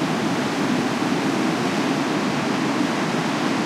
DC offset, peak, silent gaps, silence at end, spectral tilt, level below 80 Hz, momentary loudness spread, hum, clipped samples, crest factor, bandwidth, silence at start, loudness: under 0.1%; -10 dBFS; none; 0 s; -5 dB/octave; -62 dBFS; 1 LU; none; under 0.1%; 12 dB; 15.5 kHz; 0 s; -22 LUFS